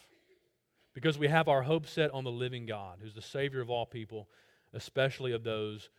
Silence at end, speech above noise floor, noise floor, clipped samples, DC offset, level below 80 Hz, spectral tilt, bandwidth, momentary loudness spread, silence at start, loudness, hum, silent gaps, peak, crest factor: 0.1 s; 41 dB; -75 dBFS; under 0.1%; under 0.1%; -70 dBFS; -6 dB/octave; 15 kHz; 18 LU; 0.95 s; -33 LUFS; none; none; -10 dBFS; 24 dB